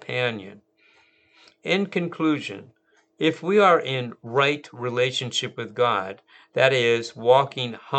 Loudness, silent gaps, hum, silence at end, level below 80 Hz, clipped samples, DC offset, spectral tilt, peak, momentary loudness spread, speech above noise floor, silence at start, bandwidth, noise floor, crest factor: -23 LUFS; none; none; 0 s; -78 dBFS; under 0.1%; under 0.1%; -5 dB/octave; -2 dBFS; 14 LU; 37 dB; 0.1 s; 9 kHz; -60 dBFS; 22 dB